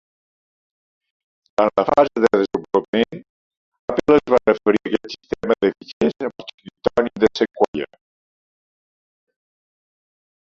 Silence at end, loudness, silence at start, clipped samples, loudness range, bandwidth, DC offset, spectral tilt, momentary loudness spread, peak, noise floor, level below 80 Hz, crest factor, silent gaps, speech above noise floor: 2.6 s; -19 LUFS; 1.6 s; under 0.1%; 5 LU; 7.6 kHz; under 0.1%; -6 dB/octave; 13 LU; -2 dBFS; under -90 dBFS; -54 dBFS; 20 dB; 2.88-2.93 s, 3.29-3.51 s, 3.57-3.72 s, 3.79-3.88 s, 5.93-6.01 s, 6.54-6.58 s, 7.68-7.73 s; over 72 dB